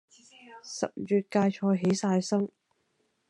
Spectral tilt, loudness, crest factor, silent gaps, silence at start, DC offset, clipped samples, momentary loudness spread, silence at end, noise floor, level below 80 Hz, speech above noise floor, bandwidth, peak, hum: -6 dB/octave; -28 LUFS; 16 dB; none; 0.5 s; under 0.1%; under 0.1%; 10 LU; 0.85 s; -74 dBFS; -76 dBFS; 47 dB; 11 kHz; -12 dBFS; none